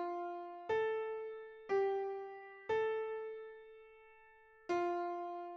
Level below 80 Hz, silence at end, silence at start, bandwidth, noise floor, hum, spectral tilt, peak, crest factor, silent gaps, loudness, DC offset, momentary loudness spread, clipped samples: -80 dBFS; 0 s; 0 s; 7.2 kHz; -63 dBFS; none; -5.5 dB/octave; -26 dBFS; 16 dB; none; -40 LUFS; under 0.1%; 18 LU; under 0.1%